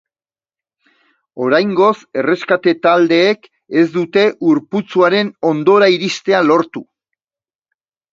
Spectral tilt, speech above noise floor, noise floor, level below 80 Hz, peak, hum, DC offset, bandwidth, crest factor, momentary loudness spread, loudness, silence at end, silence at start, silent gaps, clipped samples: -5.5 dB/octave; over 77 dB; under -90 dBFS; -64 dBFS; 0 dBFS; none; under 0.1%; 7.6 kHz; 16 dB; 8 LU; -14 LUFS; 1.3 s; 1.35 s; none; under 0.1%